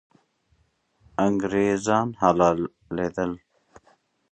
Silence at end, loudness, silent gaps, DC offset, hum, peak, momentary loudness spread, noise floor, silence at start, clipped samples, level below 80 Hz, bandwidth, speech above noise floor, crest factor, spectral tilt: 0.95 s; -24 LUFS; none; under 0.1%; none; -4 dBFS; 11 LU; -67 dBFS; 1.2 s; under 0.1%; -54 dBFS; 9.2 kHz; 44 dB; 20 dB; -6 dB/octave